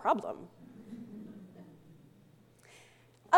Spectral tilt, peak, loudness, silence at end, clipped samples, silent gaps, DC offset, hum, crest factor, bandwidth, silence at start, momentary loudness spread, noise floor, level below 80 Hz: -5 dB/octave; -10 dBFS; -41 LUFS; 0 s; under 0.1%; none; under 0.1%; none; 24 dB; 16.5 kHz; 0 s; 23 LU; -62 dBFS; -80 dBFS